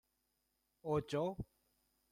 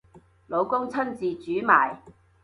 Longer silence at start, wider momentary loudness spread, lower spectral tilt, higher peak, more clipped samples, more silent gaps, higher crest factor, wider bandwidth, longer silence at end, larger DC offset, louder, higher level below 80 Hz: first, 0.85 s vs 0.15 s; about the same, 13 LU vs 11 LU; about the same, -7 dB/octave vs -6.5 dB/octave; second, -26 dBFS vs -4 dBFS; neither; neither; about the same, 18 dB vs 22 dB; first, 15 kHz vs 11.5 kHz; first, 0.7 s vs 0.35 s; neither; second, -41 LUFS vs -25 LUFS; about the same, -64 dBFS vs -64 dBFS